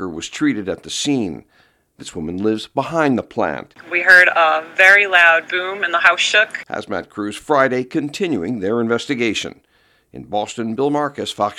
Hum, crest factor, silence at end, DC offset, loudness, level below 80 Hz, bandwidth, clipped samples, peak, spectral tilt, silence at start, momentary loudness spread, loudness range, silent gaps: none; 18 dB; 0.05 s; under 0.1%; -16 LUFS; -56 dBFS; 17.5 kHz; under 0.1%; 0 dBFS; -3.5 dB/octave; 0 s; 17 LU; 9 LU; none